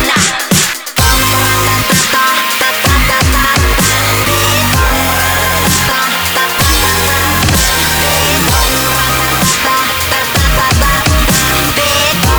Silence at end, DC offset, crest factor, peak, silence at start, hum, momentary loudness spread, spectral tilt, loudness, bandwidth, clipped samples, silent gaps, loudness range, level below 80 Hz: 0 s; under 0.1%; 10 dB; 0 dBFS; 0 s; none; 2 LU; -2.5 dB/octave; -9 LUFS; over 20 kHz; under 0.1%; none; 1 LU; -20 dBFS